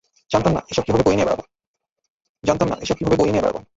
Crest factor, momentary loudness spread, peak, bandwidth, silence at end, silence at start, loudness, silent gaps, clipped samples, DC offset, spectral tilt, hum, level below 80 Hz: 18 dB; 6 LU; -2 dBFS; 8 kHz; 0.15 s; 0.3 s; -20 LUFS; 1.67-1.74 s, 2.10-2.20 s, 2.29-2.35 s; under 0.1%; under 0.1%; -6 dB/octave; none; -42 dBFS